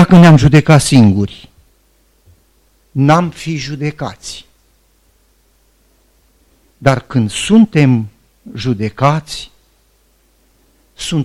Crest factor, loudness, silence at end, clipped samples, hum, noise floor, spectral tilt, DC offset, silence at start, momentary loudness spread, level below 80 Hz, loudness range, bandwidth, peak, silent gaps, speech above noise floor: 14 dB; -12 LUFS; 0 s; under 0.1%; none; -54 dBFS; -6.5 dB/octave; under 0.1%; 0 s; 19 LU; -38 dBFS; 10 LU; 12.5 kHz; 0 dBFS; none; 44 dB